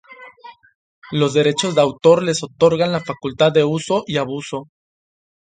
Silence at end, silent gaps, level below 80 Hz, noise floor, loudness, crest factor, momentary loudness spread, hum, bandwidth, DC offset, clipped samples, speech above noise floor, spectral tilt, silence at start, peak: 0.8 s; 0.75-1.02 s; -58 dBFS; -42 dBFS; -17 LUFS; 18 dB; 12 LU; none; 9.4 kHz; under 0.1%; under 0.1%; 25 dB; -5 dB/octave; 0.1 s; 0 dBFS